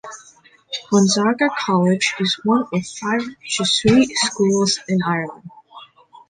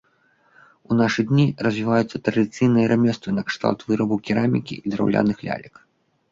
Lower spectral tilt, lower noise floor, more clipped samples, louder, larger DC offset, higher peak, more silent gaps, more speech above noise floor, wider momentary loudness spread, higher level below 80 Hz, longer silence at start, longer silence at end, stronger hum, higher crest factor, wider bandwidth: second, -4 dB/octave vs -7 dB/octave; second, -50 dBFS vs -61 dBFS; neither; first, -18 LUFS vs -21 LUFS; neither; about the same, -2 dBFS vs -4 dBFS; neither; second, 32 dB vs 41 dB; first, 10 LU vs 7 LU; about the same, -54 dBFS vs -56 dBFS; second, 0.05 s vs 0.9 s; second, 0.45 s vs 0.65 s; neither; about the same, 16 dB vs 18 dB; first, 9.8 kHz vs 7.6 kHz